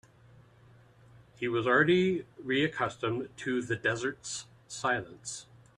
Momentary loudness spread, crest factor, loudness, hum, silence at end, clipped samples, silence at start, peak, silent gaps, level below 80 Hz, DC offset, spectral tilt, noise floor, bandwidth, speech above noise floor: 15 LU; 20 dB; -31 LUFS; none; 0.35 s; under 0.1%; 1.15 s; -12 dBFS; none; -66 dBFS; under 0.1%; -4.5 dB/octave; -59 dBFS; 11 kHz; 28 dB